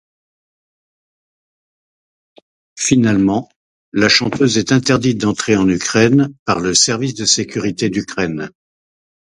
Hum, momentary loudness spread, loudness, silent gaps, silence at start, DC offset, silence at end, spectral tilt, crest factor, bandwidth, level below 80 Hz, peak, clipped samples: none; 9 LU; -15 LUFS; 3.56-3.92 s, 6.39-6.46 s; 2.75 s; under 0.1%; 0.85 s; -4 dB/octave; 18 dB; 11.5 kHz; -48 dBFS; 0 dBFS; under 0.1%